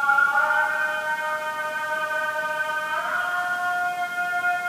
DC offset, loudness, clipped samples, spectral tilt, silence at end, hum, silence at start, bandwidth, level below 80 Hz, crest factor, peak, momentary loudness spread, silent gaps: under 0.1%; -24 LUFS; under 0.1%; -1.5 dB/octave; 0 s; none; 0 s; 15.5 kHz; -78 dBFS; 16 dB; -8 dBFS; 7 LU; none